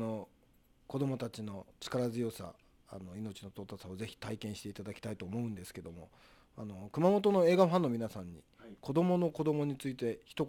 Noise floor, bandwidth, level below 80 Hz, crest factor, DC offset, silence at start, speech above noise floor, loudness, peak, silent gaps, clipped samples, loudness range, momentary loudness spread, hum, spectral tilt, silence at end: -67 dBFS; 18 kHz; -68 dBFS; 22 dB; under 0.1%; 0 s; 33 dB; -35 LUFS; -14 dBFS; none; under 0.1%; 12 LU; 21 LU; none; -7 dB/octave; 0 s